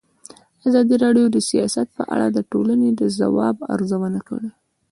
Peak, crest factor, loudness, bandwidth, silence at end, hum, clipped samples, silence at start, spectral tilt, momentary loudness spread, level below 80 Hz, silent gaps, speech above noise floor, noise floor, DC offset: -4 dBFS; 14 dB; -19 LUFS; 11.5 kHz; 0.4 s; none; under 0.1%; 0.65 s; -5.5 dB/octave; 10 LU; -60 dBFS; none; 28 dB; -46 dBFS; under 0.1%